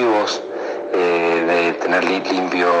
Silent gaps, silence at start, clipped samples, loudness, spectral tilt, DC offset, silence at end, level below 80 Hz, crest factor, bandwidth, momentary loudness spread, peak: none; 0 s; under 0.1%; -18 LUFS; -4 dB/octave; under 0.1%; 0 s; -70 dBFS; 16 dB; 9 kHz; 7 LU; -2 dBFS